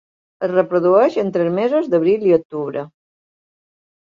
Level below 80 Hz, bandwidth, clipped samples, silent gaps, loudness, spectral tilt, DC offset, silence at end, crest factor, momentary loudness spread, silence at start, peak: -64 dBFS; 7.2 kHz; under 0.1%; 2.45-2.50 s; -17 LUFS; -8.5 dB/octave; under 0.1%; 1.3 s; 16 dB; 12 LU; 0.4 s; -2 dBFS